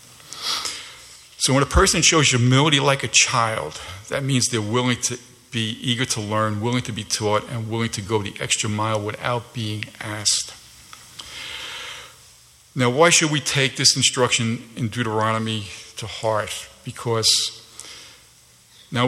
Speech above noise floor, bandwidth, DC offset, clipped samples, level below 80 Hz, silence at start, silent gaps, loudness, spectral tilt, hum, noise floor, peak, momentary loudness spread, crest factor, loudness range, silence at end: 31 dB; 14.5 kHz; under 0.1%; under 0.1%; -40 dBFS; 0.25 s; none; -20 LUFS; -3 dB/octave; none; -52 dBFS; -2 dBFS; 19 LU; 20 dB; 7 LU; 0 s